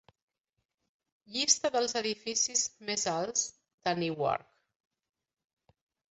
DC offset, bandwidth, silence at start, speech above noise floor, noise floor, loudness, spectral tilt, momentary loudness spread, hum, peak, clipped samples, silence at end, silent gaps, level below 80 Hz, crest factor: under 0.1%; 8.4 kHz; 1.3 s; 54 dB; -85 dBFS; -30 LUFS; -1.5 dB/octave; 10 LU; none; -10 dBFS; under 0.1%; 1.75 s; 3.74-3.78 s; -74 dBFS; 24 dB